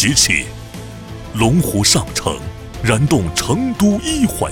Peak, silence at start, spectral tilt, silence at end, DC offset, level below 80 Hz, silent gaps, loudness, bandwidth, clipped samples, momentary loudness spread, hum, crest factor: 0 dBFS; 0 s; -4 dB/octave; 0 s; under 0.1%; -34 dBFS; none; -15 LUFS; 19.5 kHz; under 0.1%; 19 LU; none; 16 dB